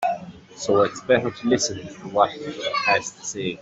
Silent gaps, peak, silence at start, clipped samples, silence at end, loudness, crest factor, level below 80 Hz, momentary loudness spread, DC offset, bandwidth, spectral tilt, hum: none; -4 dBFS; 0 s; under 0.1%; 0 s; -23 LUFS; 20 dB; -60 dBFS; 11 LU; under 0.1%; 8.2 kHz; -3.5 dB/octave; none